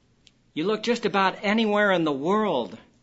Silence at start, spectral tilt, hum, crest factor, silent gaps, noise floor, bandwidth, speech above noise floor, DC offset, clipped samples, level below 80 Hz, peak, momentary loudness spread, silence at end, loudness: 0.55 s; -5.5 dB/octave; none; 18 dB; none; -60 dBFS; 8 kHz; 37 dB; under 0.1%; under 0.1%; -66 dBFS; -6 dBFS; 9 LU; 0.25 s; -24 LUFS